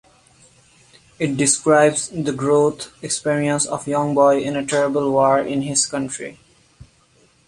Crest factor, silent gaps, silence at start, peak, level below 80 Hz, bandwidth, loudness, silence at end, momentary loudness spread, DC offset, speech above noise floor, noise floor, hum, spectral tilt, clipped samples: 18 dB; none; 1.2 s; -2 dBFS; -58 dBFS; 11.5 kHz; -18 LUFS; 0.65 s; 10 LU; under 0.1%; 38 dB; -56 dBFS; none; -4 dB/octave; under 0.1%